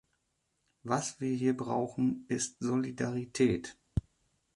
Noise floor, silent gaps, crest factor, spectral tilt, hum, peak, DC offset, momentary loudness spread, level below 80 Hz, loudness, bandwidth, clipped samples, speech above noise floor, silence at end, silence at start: -79 dBFS; none; 20 dB; -5.5 dB/octave; none; -14 dBFS; under 0.1%; 8 LU; -54 dBFS; -33 LUFS; 11.5 kHz; under 0.1%; 47 dB; 0.55 s; 0.85 s